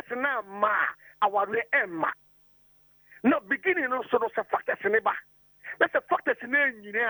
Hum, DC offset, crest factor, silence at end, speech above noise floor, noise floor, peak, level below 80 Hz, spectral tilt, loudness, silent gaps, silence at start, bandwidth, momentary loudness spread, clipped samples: none; under 0.1%; 18 dB; 0 s; 34 dB; -61 dBFS; -10 dBFS; -72 dBFS; -6.5 dB/octave; -27 LUFS; none; 0.1 s; over 20 kHz; 6 LU; under 0.1%